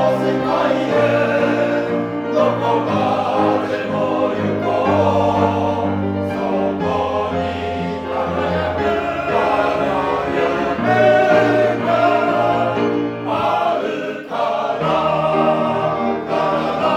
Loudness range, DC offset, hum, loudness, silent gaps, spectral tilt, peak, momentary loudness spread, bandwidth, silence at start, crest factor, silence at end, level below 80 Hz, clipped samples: 4 LU; under 0.1%; none; -18 LUFS; none; -7 dB/octave; 0 dBFS; 6 LU; 12.5 kHz; 0 s; 16 dB; 0 s; -48 dBFS; under 0.1%